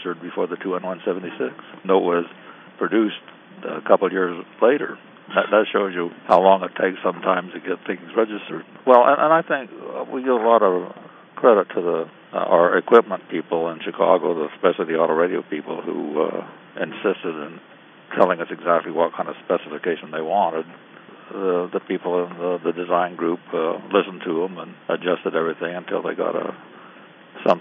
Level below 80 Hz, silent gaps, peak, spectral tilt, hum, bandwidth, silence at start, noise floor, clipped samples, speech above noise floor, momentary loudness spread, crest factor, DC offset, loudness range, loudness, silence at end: -78 dBFS; none; 0 dBFS; -8 dB/octave; none; 5.2 kHz; 0 s; -45 dBFS; under 0.1%; 25 dB; 13 LU; 22 dB; under 0.1%; 6 LU; -21 LUFS; 0 s